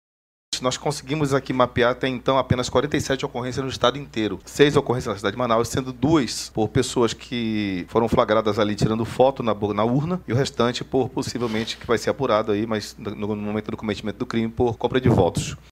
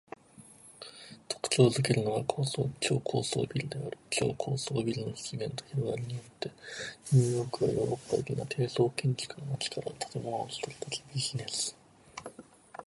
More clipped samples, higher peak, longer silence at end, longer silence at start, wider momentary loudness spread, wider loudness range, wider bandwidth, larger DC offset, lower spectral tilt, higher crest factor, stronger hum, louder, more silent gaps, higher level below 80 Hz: neither; first, -2 dBFS vs -10 dBFS; about the same, 0.15 s vs 0.05 s; about the same, 0.5 s vs 0.4 s; second, 8 LU vs 19 LU; about the same, 3 LU vs 5 LU; first, 16 kHz vs 11.5 kHz; neither; about the same, -5.5 dB/octave vs -5 dB/octave; about the same, 20 dB vs 22 dB; neither; first, -23 LUFS vs -32 LUFS; neither; first, -46 dBFS vs -64 dBFS